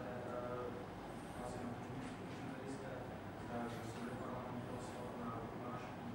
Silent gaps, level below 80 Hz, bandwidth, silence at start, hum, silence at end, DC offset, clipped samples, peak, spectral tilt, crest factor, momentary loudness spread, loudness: none; -64 dBFS; 16 kHz; 0 s; none; 0 s; under 0.1%; under 0.1%; -32 dBFS; -6.5 dB/octave; 14 dB; 3 LU; -47 LUFS